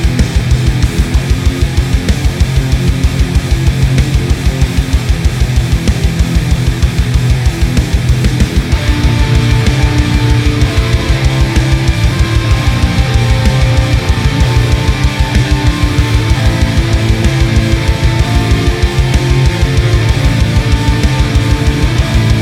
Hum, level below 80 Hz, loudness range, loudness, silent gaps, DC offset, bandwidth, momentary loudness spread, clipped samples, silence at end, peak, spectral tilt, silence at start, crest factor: none; -14 dBFS; 1 LU; -12 LUFS; none; under 0.1%; 15 kHz; 2 LU; 0.3%; 0 s; 0 dBFS; -5.5 dB/octave; 0 s; 10 dB